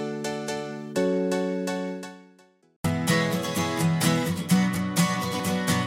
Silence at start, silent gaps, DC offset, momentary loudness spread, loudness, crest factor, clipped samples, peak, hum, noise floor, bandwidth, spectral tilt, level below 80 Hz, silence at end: 0 s; 2.76-2.84 s; under 0.1%; 9 LU; -26 LUFS; 18 dB; under 0.1%; -8 dBFS; none; -58 dBFS; 16.5 kHz; -5 dB/octave; -62 dBFS; 0 s